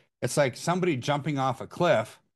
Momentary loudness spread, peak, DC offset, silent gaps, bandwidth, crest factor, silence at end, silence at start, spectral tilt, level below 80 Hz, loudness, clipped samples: 4 LU; -10 dBFS; under 0.1%; none; 12.5 kHz; 18 dB; 0.2 s; 0.2 s; -5.5 dB/octave; -68 dBFS; -27 LUFS; under 0.1%